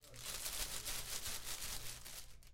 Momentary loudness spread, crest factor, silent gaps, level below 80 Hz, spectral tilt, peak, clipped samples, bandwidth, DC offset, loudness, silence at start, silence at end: 8 LU; 18 dB; none; -56 dBFS; -0.5 dB/octave; -28 dBFS; under 0.1%; 16.5 kHz; under 0.1%; -44 LUFS; 0 s; 0 s